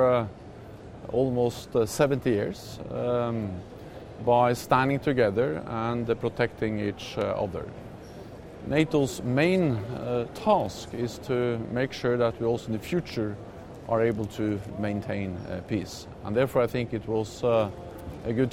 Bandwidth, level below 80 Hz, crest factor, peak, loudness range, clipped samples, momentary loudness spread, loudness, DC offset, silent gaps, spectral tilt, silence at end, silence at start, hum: 16 kHz; -52 dBFS; 20 dB; -8 dBFS; 4 LU; under 0.1%; 17 LU; -27 LUFS; under 0.1%; none; -6.5 dB/octave; 0 s; 0 s; none